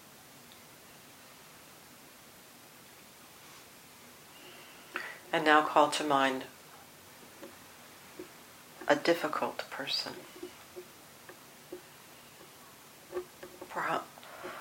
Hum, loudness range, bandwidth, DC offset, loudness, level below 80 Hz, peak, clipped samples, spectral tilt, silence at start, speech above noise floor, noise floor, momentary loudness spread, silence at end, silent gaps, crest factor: none; 21 LU; 16.5 kHz; under 0.1%; -31 LUFS; -78 dBFS; -8 dBFS; under 0.1%; -3 dB/octave; 0.05 s; 25 dB; -55 dBFS; 24 LU; 0 s; none; 28 dB